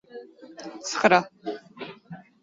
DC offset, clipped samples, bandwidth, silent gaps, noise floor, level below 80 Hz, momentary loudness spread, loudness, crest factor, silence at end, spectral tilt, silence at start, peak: under 0.1%; under 0.1%; 8 kHz; none; -46 dBFS; -70 dBFS; 25 LU; -24 LUFS; 24 dB; 0.2 s; -3.5 dB/octave; 0.15 s; -4 dBFS